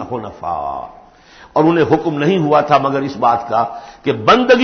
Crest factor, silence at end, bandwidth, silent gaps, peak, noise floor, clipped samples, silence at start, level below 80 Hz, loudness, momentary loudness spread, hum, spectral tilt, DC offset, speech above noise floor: 16 dB; 0 s; 6.6 kHz; none; 0 dBFS; -43 dBFS; under 0.1%; 0 s; -48 dBFS; -15 LUFS; 12 LU; none; -6.5 dB/octave; under 0.1%; 28 dB